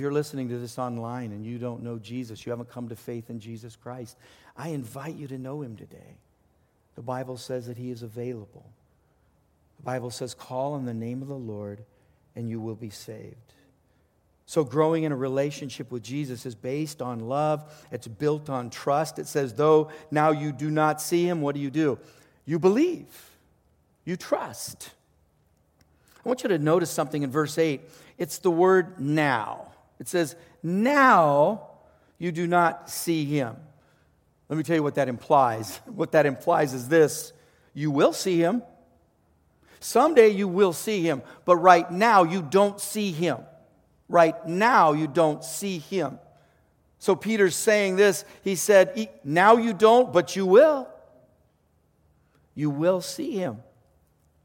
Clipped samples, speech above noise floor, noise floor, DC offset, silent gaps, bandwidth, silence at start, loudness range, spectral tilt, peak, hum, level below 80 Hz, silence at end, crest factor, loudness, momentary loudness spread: under 0.1%; 42 dB; -66 dBFS; under 0.1%; none; 17 kHz; 0 s; 17 LU; -5.5 dB/octave; -2 dBFS; none; -68 dBFS; 0.8 s; 24 dB; -24 LUFS; 19 LU